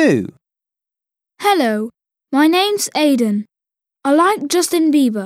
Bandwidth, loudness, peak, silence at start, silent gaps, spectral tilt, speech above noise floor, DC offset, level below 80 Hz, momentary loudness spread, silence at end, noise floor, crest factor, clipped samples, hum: 16 kHz; -16 LUFS; -2 dBFS; 0 s; none; -4 dB/octave; 72 dB; under 0.1%; -70 dBFS; 10 LU; 0 s; -87 dBFS; 14 dB; under 0.1%; none